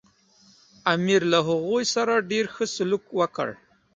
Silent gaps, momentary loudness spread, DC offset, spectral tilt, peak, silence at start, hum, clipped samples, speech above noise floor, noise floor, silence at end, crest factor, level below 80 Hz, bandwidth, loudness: none; 7 LU; under 0.1%; -4 dB/octave; -4 dBFS; 0.85 s; none; under 0.1%; 35 dB; -58 dBFS; 0.4 s; 20 dB; -66 dBFS; 9.4 kHz; -24 LUFS